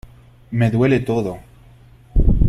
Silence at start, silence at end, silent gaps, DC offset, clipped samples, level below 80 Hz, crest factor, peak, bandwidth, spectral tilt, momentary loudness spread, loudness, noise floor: 0.5 s; 0 s; none; under 0.1%; under 0.1%; -22 dBFS; 16 dB; -2 dBFS; 12 kHz; -8.5 dB/octave; 11 LU; -19 LUFS; -46 dBFS